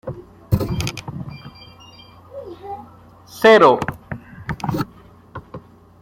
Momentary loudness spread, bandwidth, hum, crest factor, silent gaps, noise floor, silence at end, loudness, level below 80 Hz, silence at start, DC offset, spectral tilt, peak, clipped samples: 27 LU; 16.5 kHz; none; 20 dB; none; -45 dBFS; 0.45 s; -17 LUFS; -42 dBFS; 0.05 s; under 0.1%; -6 dB/octave; -2 dBFS; under 0.1%